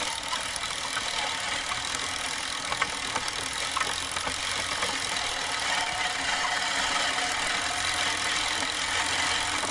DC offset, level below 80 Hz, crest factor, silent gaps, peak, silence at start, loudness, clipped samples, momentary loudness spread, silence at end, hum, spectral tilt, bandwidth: under 0.1%; -54 dBFS; 20 dB; none; -10 dBFS; 0 s; -27 LUFS; under 0.1%; 4 LU; 0 s; none; 0 dB/octave; 12 kHz